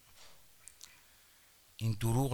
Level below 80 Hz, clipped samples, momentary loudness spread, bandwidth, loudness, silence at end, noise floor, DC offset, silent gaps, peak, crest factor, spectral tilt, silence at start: -54 dBFS; under 0.1%; 27 LU; over 20 kHz; -35 LUFS; 0 s; -64 dBFS; under 0.1%; none; -18 dBFS; 20 dB; -6 dB/octave; 0.15 s